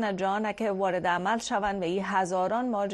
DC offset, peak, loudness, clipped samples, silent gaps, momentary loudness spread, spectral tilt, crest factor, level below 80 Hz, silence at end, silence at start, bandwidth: under 0.1%; -14 dBFS; -28 LUFS; under 0.1%; none; 2 LU; -5 dB/octave; 14 dB; -58 dBFS; 0 s; 0 s; 11.5 kHz